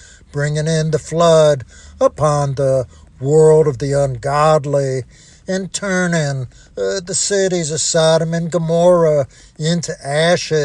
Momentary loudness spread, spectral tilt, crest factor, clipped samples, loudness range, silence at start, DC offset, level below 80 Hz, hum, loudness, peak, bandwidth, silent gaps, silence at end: 11 LU; -5 dB/octave; 14 dB; under 0.1%; 4 LU; 0.35 s; under 0.1%; -44 dBFS; none; -16 LUFS; -2 dBFS; 11 kHz; none; 0 s